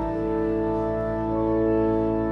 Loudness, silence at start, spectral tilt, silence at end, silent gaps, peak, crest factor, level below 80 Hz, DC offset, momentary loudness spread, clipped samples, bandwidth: -24 LUFS; 0 s; -10 dB/octave; 0 s; none; -12 dBFS; 12 dB; -38 dBFS; under 0.1%; 4 LU; under 0.1%; 5.4 kHz